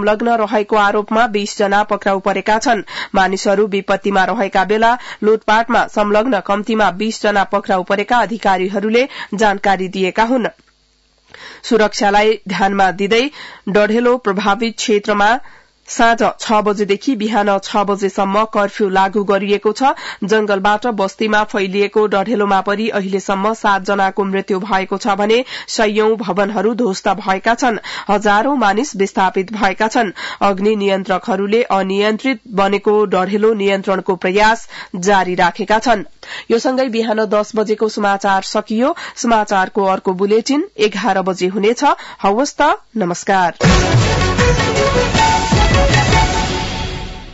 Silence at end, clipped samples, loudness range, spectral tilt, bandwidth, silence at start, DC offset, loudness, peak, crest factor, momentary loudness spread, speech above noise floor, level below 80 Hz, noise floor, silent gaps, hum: 0 s; under 0.1%; 2 LU; -5 dB/octave; 8 kHz; 0 s; under 0.1%; -15 LUFS; -2 dBFS; 12 dB; 5 LU; 42 dB; -32 dBFS; -56 dBFS; none; none